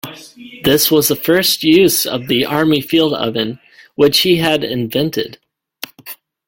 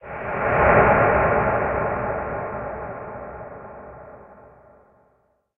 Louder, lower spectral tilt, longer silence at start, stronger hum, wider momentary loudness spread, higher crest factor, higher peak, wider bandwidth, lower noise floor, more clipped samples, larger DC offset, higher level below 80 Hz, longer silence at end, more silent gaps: first, -14 LUFS vs -20 LUFS; second, -4 dB/octave vs -10.5 dB/octave; about the same, 0.05 s vs 0.05 s; neither; second, 20 LU vs 24 LU; second, 16 dB vs 22 dB; about the same, 0 dBFS vs -2 dBFS; first, 17 kHz vs 3.5 kHz; second, -37 dBFS vs -65 dBFS; neither; neither; second, -50 dBFS vs -40 dBFS; second, 0.35 s vs 1.1 s; neither